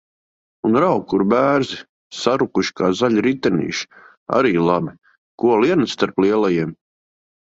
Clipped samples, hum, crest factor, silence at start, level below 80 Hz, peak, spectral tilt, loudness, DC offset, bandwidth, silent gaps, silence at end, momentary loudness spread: under 0.1%; none; 18 dB; 0.65 s; -56 dBFS; -2 dBFS; -6 dB/octave; -18 LUFS; under 0.1%; 8 kHz; 1.89-2.11 s, 4.17-4.26 s, 5.17-5.38 s; 0.8 s; 11 LU